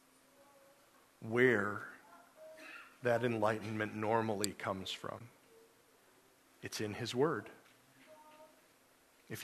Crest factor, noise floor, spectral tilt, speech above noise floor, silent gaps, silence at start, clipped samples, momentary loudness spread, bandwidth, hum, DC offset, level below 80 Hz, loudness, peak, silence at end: 28 dB; -68 dBFS; -5 dB/octave; 32 dB; none; 1.2 s; under 0.1%; 25 LU; 13.5 kHz; none; under 0.1%; -78 dBFS; -36 LUFS; -12 dBFS; 0 s